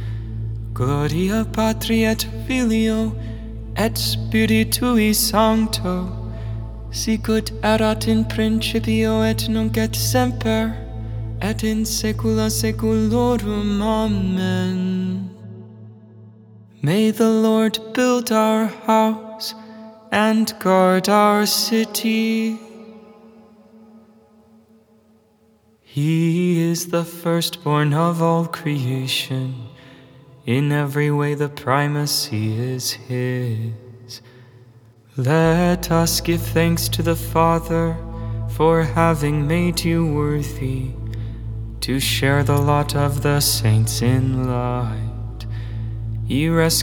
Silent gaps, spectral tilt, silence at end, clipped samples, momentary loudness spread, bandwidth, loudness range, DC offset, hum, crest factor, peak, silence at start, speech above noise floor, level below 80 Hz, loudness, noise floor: none; -5 dB/octave; 0 s; under 0.1%; 13 LU; over 20 kHz; 5 LU; under 0.1%; none; 20 dB; 0 dBFS; 0 s; 38 dB; -36 dBFS; -20 LUFS; -56 dBFS